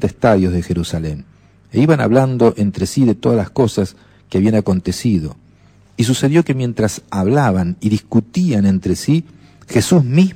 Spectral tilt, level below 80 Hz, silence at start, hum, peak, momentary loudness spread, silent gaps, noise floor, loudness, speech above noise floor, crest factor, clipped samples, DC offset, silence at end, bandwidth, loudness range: -6.5 dB/octave; -40 dBFS; 0 s; none; 0 dBFS; 8 LU; none; -48 dBFS; -16 LUFS; 33 dB; 14 dB; under 0.1%; under 0.1%; 0 s; 15.5 kHz; 2 LU